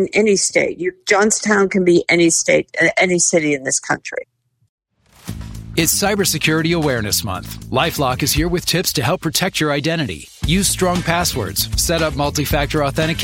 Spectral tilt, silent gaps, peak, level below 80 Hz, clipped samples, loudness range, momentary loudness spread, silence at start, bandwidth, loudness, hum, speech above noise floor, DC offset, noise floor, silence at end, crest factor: -3.5 dB/octave; 4.69-4.78 s; 0 dBFS; -34 dBFS; under 0.1%; 4 LU; 9 LU; 0 s; 16.5 kHz; -16 LUFS; none; 30 dB; under 0.1%; -47 dBFS; 0 s; 18 dB